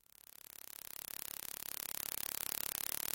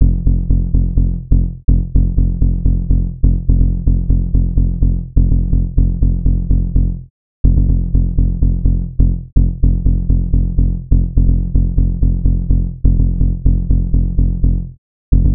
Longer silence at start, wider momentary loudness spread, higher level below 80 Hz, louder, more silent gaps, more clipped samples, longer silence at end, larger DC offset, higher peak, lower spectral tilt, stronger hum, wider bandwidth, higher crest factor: first, 0.6 s vs 0 s; first, 14 LU vs 2 LU; second, -76 dBFS vs -14 dBFS; second, -41 LUFS vs -17 LUFS; second, none vs 7.10-7.44 s, 14.78-15.12 s; neither; about the same, 0 s vs 0 s; second, under 0.1% vs 4%; second, -12 dBFS vs 0 dBFS; second, 0.5 dB/octave vs -16.5 dB/octave; neither; first, 17 kHz vs 0.9 kHz; first, 32 dB vs 12 dB